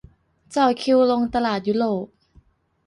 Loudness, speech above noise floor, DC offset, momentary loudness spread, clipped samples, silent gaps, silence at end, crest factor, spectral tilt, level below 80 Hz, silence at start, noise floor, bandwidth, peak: -21 LUFS; 37 dB; under 0.1%; 11 LU; under 0.1%; none; 0.8 s; 16 dB; -5.5 dB/octave; -54 dBFS; 0.5 s; -57 dBFS; 11.5 kHz; -6 dBFS